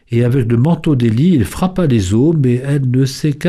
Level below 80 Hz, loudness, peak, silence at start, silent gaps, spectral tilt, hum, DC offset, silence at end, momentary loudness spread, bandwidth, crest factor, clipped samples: -36 dBFS; -14 LUFS; -4 dBFS; 0.1 s; none; -7.5 dB/octave; none; under 0.1%; 0 s; 3 LU; 14 kHz; 10 dB; under 0.1%